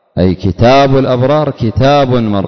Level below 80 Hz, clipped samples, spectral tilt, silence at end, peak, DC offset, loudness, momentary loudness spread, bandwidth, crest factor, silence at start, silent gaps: -30 dBFS; under 0.1%; -7.5 dB/octave; 0 s; 0 dBFS; under 0.1%; -10 LUFS; 5 LU; 6.4 kHz; 10 dB; 0.15 s; none